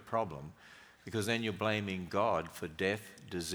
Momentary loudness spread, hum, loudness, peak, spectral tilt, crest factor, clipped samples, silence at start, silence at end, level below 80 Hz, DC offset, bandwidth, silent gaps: 18 LU; none; -36 LUFS; -16 dBFS; -4.5 dB/octave; 20 dB; under 0.1%; 0 s; 0 s; -66 dBFS; under 0.1%; over 20 kHz; none